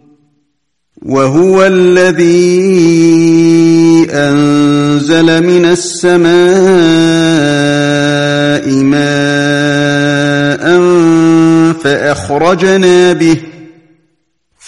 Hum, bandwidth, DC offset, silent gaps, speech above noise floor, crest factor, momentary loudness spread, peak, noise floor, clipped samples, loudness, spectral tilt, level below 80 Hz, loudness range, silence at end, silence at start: none; 11.5 kHz; 0.7%; none; 59 dB; 8 dB; 4 LU; 0 dBFS; -66 dBFS; under 0.1%; -8 LUFS; -5.5 dB/octave; -46 dBFS; 3 LU; 1 s; 1.05 s